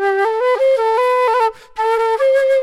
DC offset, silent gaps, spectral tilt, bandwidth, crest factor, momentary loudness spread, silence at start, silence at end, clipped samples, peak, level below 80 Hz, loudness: under 0.1%; none; -1.5 dB/octave; 13 kHz; 8 dB; 4 LU; 0 s; 0 s; under 0.1%; -6 dBFS; -58 dBFS; -15 LUFS